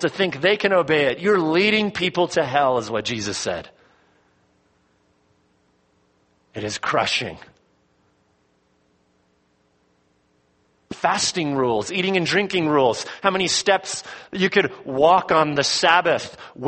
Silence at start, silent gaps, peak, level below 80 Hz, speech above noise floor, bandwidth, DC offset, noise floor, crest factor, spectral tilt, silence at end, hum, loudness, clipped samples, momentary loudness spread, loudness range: 0 s; none; -2 dBFS; -60 dBFS; 44 dB; 8.8 kHz; under 0.1%; -64 dBFS; 22 dB; -3.5 dB/octave; 0 s; none; -20 LUFS; under 0.1%; 11 LU; 12 LU